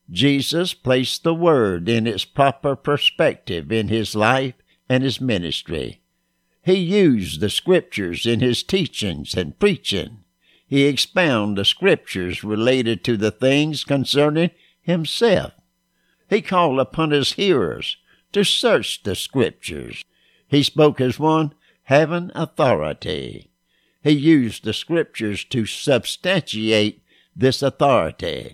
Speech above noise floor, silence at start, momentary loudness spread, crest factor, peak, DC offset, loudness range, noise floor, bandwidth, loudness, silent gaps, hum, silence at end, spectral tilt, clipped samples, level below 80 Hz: 50 dB; 0.1 s; 9 LU; 18 dB; -2 dBFS; under 0.1%; 2 LU; -69 dBFS; 16 kHz; -19 LUFS; none; none; 0 s; -5 dB/octave; under 0.1%; -50 dBFS